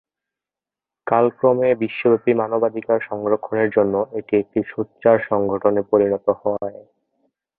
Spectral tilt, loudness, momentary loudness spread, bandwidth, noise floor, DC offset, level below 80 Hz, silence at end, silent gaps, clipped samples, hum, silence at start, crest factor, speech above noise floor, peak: -11.5 dB/octave; -19 LUFS; 7 LU; 4 kHz; -89 dBFS; under 0.1%; -60 dBFS; 0.85 s; none; under 0.1%; none; 1.05 s; 18 dB; 70 dB; -2 dBFS